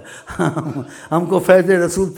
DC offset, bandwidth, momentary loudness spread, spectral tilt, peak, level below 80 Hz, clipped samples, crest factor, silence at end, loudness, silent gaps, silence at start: under 0.1%; 18 kHz; 16 LU; -6 dB/octave; -2 dBFS; -46 dBFS; under 0.1%; 16 dB; 0 s; -16 LUFS; none; 0 s